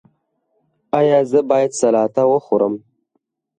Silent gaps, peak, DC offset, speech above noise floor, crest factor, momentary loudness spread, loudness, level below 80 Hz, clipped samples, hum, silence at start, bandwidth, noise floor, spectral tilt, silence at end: none; -4 dBFS; under 0.1%; 55 dB; 14 dB; 6 LU; -16 LUFS; -68 dBFS; under 0.1%; none; 0.95 s; 9.6 kHz; -71 dBFS; -6 dB/octave; 0.8 s